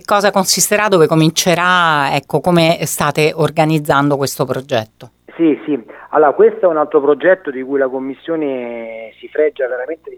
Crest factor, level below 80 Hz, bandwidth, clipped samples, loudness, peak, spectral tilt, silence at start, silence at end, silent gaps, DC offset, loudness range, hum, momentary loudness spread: 14 dB; -54 dBFS; 20 kHz; under 0.1%; -14 LUFS; 0 dBFS; -4 dB/octave; 0.1 s; 0 s; none; under 0.1%; 4 LU; none; 11 LU